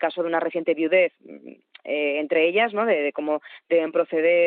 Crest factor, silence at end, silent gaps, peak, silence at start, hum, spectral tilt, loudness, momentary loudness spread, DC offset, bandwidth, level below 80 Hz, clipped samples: 14 dB; 0 s; none; -8 dBFS; 0 s; none; -2 dB/octave; -23 LUFS; 7 LU; under 0.1%; 4.4 kHz; under -90 dBFS; under 0.1%